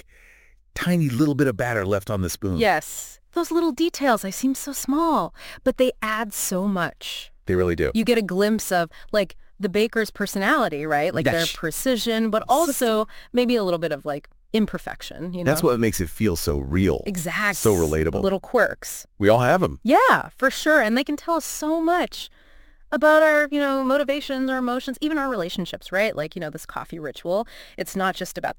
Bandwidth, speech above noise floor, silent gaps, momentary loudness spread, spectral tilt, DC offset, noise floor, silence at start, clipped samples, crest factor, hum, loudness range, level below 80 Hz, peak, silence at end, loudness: 17 kHz; 31 dB; none; 12 LU; -4.5 dB/octave; under 0.1%; -53 dBFS; 0.75 s; under 0.1%; 20 dB; none; 4 LU; -44 dBFS; -2 dBFS; 0.05 s; -22 LUFS